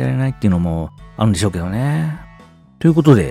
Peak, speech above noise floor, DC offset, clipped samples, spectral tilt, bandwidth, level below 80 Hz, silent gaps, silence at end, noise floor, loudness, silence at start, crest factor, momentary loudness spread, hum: 0 dBFS; 29 dB; under 0.1%; under 0.1%; -7 dB/octave; 13.5 kHz; -40 dBFS; none; 0 s; -44 dBFS; -17 LUFS; 0 s; 16 dB; 12 LU; none